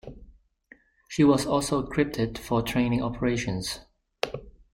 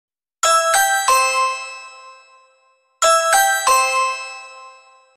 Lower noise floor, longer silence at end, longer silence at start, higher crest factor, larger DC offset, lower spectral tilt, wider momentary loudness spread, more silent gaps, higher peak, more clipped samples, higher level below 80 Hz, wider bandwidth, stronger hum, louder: about the same, -57 dBFS vs -59 dBFS; second, 0.25 s vs 0.45 s; second, 0.05 s vs 0.45 s; about the same, 20 dB vs 16 dB; neither; first, -5.5 dB/octave vs 3 dB/octave; second, 13 LU vs 19 LU; neither; second, -8 dBFS vs -4 dBFS; neither; first, -48 dBFS vs -62 dBFS; about the same, 16.5 kHz vs 16 kHz; neither; second, -26 LUFS vs -16 LUFS